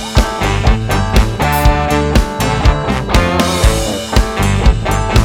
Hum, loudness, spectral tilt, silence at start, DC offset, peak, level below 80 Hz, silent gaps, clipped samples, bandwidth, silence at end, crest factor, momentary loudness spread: none; -13 LUFS; -5 dB/octave; 0 s; under 0.1%; 0 dBFS; -16 dBFS; none; under 0.1%; 19 kHz; 0 s; 12 dB; 3 LU